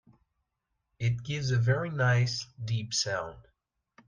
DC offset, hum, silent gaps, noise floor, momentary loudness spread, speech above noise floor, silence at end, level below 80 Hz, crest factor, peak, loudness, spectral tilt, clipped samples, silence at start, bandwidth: under 0.1%; none; none; -82 dBFS; 9 LU; 53 dB; 0.65 s; -60 dBFS; 18 dB; -14 dBFS; -30 LUFS; -4.5 dB/octave; under 0.1%; 1 s; 9.8 kHz